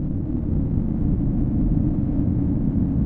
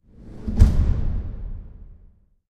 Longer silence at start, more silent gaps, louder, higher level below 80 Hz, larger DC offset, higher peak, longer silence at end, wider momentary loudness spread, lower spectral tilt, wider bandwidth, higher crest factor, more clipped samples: second, 0 s vs 0.2 s; neither; about the same, -23 LUFS vs -23 LUFS; about the same, -28 dBFS vs -24 dBFS; neither; second, -8 dBFS vs 0 dBFS; second, 0 s vs 0.55 s; second, 3 LU vs 21 LU; first, -13.5 dB/octave vs -8.5 dB/octave; second, 2.8 kHz vs 8.6 kHz; second, 14 dB vs 22 dB; neither